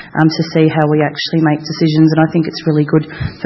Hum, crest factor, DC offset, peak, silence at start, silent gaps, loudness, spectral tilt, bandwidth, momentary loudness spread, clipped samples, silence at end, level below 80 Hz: none; 12 dB; under 0.1%; 0 dBFS; 0 s; none; -13 LUFS; -7.5 dB/octave; 6 kHz; 5 LU; under 0.1%; 0 s; -44 dBFS